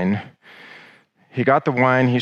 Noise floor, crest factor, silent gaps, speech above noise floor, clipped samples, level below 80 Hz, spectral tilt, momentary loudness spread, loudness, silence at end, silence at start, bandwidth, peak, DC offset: -52 dBFS; 18 dB; none; 34 dB; under 0.1%; -68 dBFS; -8 dB/octave; 15 LU; -18 LUFS; 0 s; 0 s; 6.8 kHz; -2 dBFS; under 0.1%